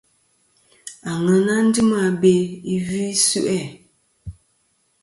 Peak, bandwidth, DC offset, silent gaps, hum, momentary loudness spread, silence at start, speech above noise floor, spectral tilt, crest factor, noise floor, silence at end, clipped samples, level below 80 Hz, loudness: -4 dBFS; 11.5 kHz; under 0.1%; none; none; 23 LU; 0.85 s; 47 dB; -4.5 dB/octave; 18 dB; -65 dBFS; 0.7 s; under 0.1%; -52 dBFS; -19 LUFS